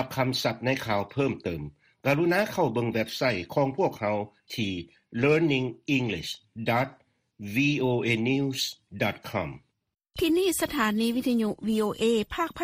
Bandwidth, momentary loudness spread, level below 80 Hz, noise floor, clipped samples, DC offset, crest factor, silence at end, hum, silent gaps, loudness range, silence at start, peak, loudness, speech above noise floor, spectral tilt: 15.5 kHz; 9 LU; -56 dBFS; -57 dBFS; under 0.1%; under 0.1%; 18 dB; 0 s; none; none; 1 LU; 0 s; -10 dBFS; -27 LUFS; 30 dB; -5 dB/octave